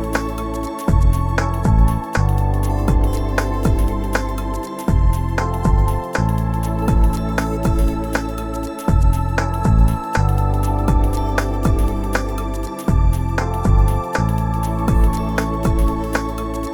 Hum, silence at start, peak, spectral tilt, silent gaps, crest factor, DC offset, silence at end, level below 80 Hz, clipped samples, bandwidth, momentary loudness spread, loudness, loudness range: none; 0 s; -2 dBFS; -7 dB/octave; none; 14 dB; under 0.1%; 0 s; -20 dBFS; under 0.1%; 17.5 kHz; 6 LU; -19 LUFS; 1 LU